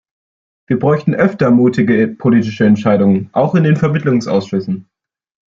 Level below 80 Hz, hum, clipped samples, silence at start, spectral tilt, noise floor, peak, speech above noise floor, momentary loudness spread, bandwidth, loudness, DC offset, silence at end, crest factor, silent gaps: -52 dBFS; none; under 0.1%; 0.7 s; -8.5 dB/octave; under -90 dBFS; 0 dBFS; over 78 dB; 8 LU; 7.4 kHz; -13 LUFS; under 0.1%; 0.65 s; 14 dB; none